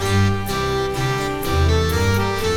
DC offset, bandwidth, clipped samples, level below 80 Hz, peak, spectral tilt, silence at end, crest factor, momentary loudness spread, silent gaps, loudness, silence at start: under 0.1%; 17.5 kHz; under 0.1%; -28 dBFS; -6 dBFS; -5.5 dB/octave; 0 s; 12 dB; 4 LU; none; -20 LUFS; 0 s